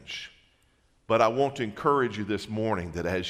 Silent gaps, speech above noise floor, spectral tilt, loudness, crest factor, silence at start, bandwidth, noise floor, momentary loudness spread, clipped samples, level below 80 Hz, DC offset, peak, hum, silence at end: none; 39 dB; -6 dB/octave; -27 LUFS; 22 dB; 0.05 s; 13.5 kHz; -66 dBFS; 12 LU; under 0.1%; -58 dBFS; under 0.1%; -8 dBFS; none; 0 s